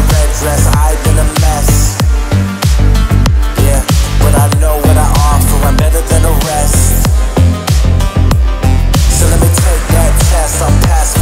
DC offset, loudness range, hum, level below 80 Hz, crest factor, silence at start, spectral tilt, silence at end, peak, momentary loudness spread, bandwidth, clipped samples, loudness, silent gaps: under 0.1%; 1 LU; none; -10 dBFS; 8 dB; 0 s; -5 dB/octave; 0 s; 0 dBFS; 3 LU; 16.5 kHz; under 0.1%; -10 LUFS; none